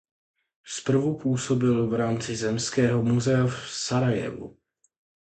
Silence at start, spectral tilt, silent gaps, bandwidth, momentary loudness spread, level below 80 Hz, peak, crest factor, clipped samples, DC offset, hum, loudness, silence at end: 0.65 s; -5.5 dB/octave; none; 9.2 kHz; 9 LU; -56 dBFS; -10 dBFS; 16 dB; under 0.1%; under 0.1%; none; -25 LUFS; 0.75 s